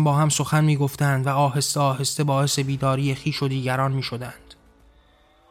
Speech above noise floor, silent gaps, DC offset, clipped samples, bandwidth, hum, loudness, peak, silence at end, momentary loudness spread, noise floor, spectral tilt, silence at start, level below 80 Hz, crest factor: 35 dB; none; under 0.1%; under 0.1%; 16 kHz; none; -22 LUFS; -6 dBFS; 0.95 s; 5 LU; -57 dBFS; -5 dB/octave; 0 s; -54 dBFS; 16 dB